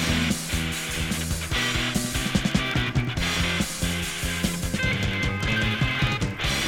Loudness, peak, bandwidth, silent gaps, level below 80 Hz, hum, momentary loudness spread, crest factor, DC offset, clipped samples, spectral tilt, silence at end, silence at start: -25 LUFS; -8 dBFS; 19.5 kHz; none; -34 dBFS; none; 3 LU; 18 dB; under 0.1%; under 0.1%; -3.5 dB/octave; 0 s; 0 s